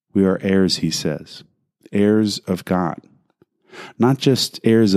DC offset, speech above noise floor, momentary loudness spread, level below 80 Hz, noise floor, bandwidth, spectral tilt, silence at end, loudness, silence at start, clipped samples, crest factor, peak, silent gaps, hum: under 0.1%; 43 dB; 16 LU; -58 dBFS; -60 dBFS; 15.5 kHz; -5.5 dB/octave; 0 s; -19 LUFS; 0.15 s; under 0.1%; 18 dB; -2 dBFS; none; none